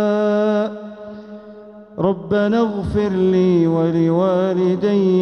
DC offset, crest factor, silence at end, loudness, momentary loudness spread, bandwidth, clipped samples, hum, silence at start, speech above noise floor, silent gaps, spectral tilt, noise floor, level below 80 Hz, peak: under 0.1%; 12 dB; 0 s; -17 LUFS; 19 LU; 6.6 kHz; under 0.1%; none; 0 s; 23 dB; none; -8.5 dB/octave; -39 dBFS; -46 dBFS; -6 dBFS